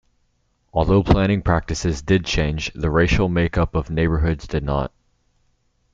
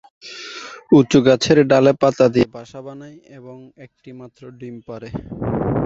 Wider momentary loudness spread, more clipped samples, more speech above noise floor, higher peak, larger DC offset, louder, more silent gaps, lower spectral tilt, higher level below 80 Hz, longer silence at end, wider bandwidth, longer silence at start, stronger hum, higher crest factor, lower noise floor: second, 7 LU vs 23 LU; neither; first, 47 dB vs 17 dB; about the same, 0 dBFS vs -2 dBFS; neither; second, -20 LUFS vs -15 LUFS; neither; about the same, -6.5 dB/octave vs -6 dB/octave; first, -30 dBFS vs -46 dBFS; first, 1.05 s vs 0 s; about the same, 7.8 kHz vs 8 kHz; first, 0.75 s vs 0.25 s; neither; about the same, 20 dB vs 18 dB; first, -66 dBFS vs -35 dBFS